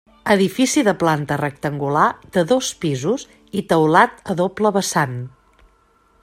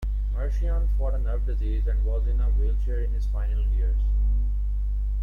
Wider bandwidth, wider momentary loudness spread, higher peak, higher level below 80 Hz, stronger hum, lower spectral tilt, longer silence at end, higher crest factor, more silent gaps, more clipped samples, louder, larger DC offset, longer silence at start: first, 16 kHz vs 2.1 kHz; first, 9 LU vs 3 LU; first, 0 dBFS vs -16 dBFS; second, -56 dBFS vs -22 dBFS; second, none vs 50 Hz at -25 dBFS; second, -5 dB/octave vs -9 dB/octave; first, 0.95 s vs 0 s; first, 18 dB vs 6 dB; neither; neither; first, -18 LUFS vs -27 LUFS; neither; first, 0.25 s vs 0 s